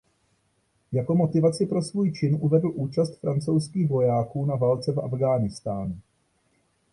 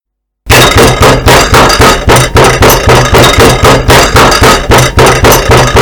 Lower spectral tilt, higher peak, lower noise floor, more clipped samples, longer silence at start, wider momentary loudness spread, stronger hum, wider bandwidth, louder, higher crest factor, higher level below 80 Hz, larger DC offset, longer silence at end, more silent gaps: first, -8 dB/octave vs -4 dB/octave; second, -8 dBFS vs 0 dBFS; first, -69 dBFS vs -28 dBFS; second, under 0.1% vs 20%; first, 0.9 s vs 0.45 s; first, 8 LU vs 2 LU; neither; second, 11.5 kHz vs over 20 kHz; second, -25 LUFS vs -3 LUFS; first, 16 dB vs 4 dB; second, -56 dBFS vs -14 dBFS; second, under 0.1% vs 1%; first, 0.9 s vs 0 s; neither